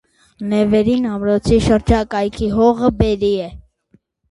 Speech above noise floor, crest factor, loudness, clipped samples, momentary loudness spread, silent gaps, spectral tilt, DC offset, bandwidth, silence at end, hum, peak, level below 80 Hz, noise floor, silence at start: 41 dB; 16 dB; -16 LUFS; under 0.1%; 7 LU; none; -7 dB/octave; under 0.1%; 11.5 kHz; 0.7 s; none; 0 dBFS; -30 dBFS; -57 dBFS; 0.4 s